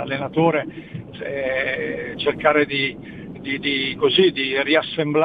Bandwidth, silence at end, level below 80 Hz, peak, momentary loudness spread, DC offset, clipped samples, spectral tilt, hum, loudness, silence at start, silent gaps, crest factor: 5 kHz; 0 s; -54 dBFS; -2 dBFS; 16 LU; under 0.1%; under 0.1%; -7.5 dB/octave; none; -20 LUFS; 0 s; none; 18 dB